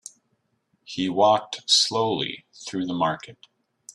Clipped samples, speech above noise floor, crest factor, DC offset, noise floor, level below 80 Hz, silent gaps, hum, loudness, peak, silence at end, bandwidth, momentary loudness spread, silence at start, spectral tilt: under 0.1%; 48 dB; 20 dB; under 0.1%; -72 dBFS; -66 dBFS; none; none; -22 LUFS; -6 dBFS; 0.05 s; 12.5 kHz; 16 LU; 0.9 s; -3 dB/octave